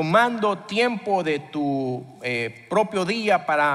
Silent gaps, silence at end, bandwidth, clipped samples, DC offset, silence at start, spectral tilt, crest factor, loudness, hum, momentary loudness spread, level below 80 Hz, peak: none; 0 s; 13.5 kHz; under 0.1%; under 0.1%; 0 s; -5.5 dB/octave; 18 dB; -23 LUFS; none; 8 LU; -66 dBFS; -6 dBFS